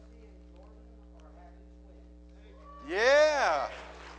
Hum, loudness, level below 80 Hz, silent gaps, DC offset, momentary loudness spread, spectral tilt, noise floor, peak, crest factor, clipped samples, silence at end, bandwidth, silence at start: none; -26 LUFS; -54 dBFS; none; under 0.1%; 24 LU; -3 dB/octave; -52 dBFS; -12 dBFS; 20 dB; under 0.1%; 0 s; 9.4 kHz; 2.65 s